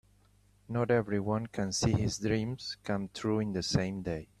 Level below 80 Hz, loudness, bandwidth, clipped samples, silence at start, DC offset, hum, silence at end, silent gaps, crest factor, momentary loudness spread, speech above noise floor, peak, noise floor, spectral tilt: -54 dBFS; -32 LUFS; 13 kHz; under 0.1%; 0.7 s; under 0.1%; none; 0.15 s; none; 20 dB; 8 LU; 33 dB; -14 dBFS; -65 dBFS; -5.5 dB/octave